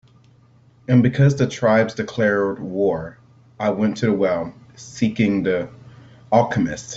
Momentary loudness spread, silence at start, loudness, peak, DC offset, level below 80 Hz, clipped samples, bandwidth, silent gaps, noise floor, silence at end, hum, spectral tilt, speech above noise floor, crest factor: 14 LU; 0.9 s; -20 LUFS; -2 dBFS; under 0.1%; -54 dBFS; under 0.1%; 8 kHz; none; -52 dBFS; 0 s; none; -7 dB/octave; 34 dB; 18 dB